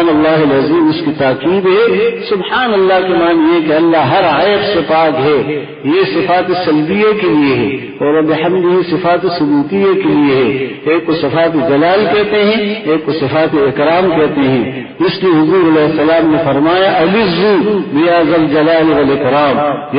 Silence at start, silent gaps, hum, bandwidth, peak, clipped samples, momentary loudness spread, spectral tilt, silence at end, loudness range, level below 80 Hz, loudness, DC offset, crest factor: 0 s; none; none; 5.2 kHz; 0 dBFS; under 0.1%; 4 LU; -12 dB/octave; 0 s; 2 LU; -44 dBFS; -11 LUFS; under 0.1%; 10 dB